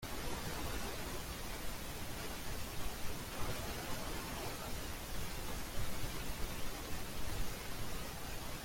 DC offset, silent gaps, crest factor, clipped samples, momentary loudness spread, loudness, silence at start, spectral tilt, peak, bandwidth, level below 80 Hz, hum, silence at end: under 0.1%; none; 14 dB; under 0.1%; 2 LU; -44 LUFS; 0 s; -3.5 dB/octave; -26 dBFS; 16.5 kHz; -48 dBFS; none; 0 s